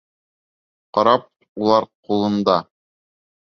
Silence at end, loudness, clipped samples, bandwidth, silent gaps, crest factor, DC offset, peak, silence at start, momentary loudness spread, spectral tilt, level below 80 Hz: 0.8 s; -19 LUFS; under 0.1%; 6.6 kHz; 1.49-1.55 s, 1.95-2.03 s; 20 dB; under 0.1%; -2 dBFS; 0.95 s; 7 LU; -6.5 dB/octave; -62 dBFS